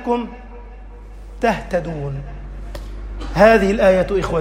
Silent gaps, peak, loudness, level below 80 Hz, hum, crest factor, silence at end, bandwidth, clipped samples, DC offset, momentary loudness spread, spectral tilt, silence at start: none; 0 dBFS; -17 LUFS; -32 dBFS; 50 Hz at -50 dBFS; 18 dB; 0 s; 16 kHz; under 0.1%; under 0.1%; 24 LU; -6.5 dB/octave; 0 s